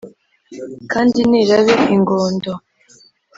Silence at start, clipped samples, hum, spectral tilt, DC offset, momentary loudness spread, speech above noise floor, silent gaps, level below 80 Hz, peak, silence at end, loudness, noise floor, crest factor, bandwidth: 0.05 s; under 0.1%; none; -6 dB/octave; under 0.1%; 19 LU; 36 dB; none; -54 dBFS; -2 dBFS; 0.8 s; -14 LUFS; -50 dBFS; 16 dB; 7.8 kHz